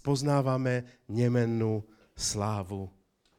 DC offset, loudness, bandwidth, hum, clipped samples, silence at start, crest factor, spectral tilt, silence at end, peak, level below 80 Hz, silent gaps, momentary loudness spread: under 0.1%; -30 LUFS; 15 kHz; none; under 0.1%; 0.05 s; 18 dB; -5.5 dB/octave; 0.5 s; -12 dBFS; -58 dBFS; none; 10 LU